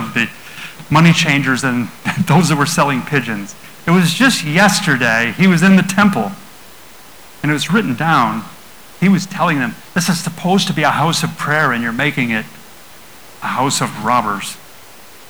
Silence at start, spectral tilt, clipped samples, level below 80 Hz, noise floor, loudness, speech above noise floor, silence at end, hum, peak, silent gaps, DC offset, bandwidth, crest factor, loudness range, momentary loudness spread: 0 s; -4.5 dB/octave; under 0.1%; -52 dBFS; -40 dBFS; -14 LUFS; 26 dB; 0.75 s; none; -2 dBFS; none; 0.9%; over 20 kHz; 14 dB; 5 LU; 13 LU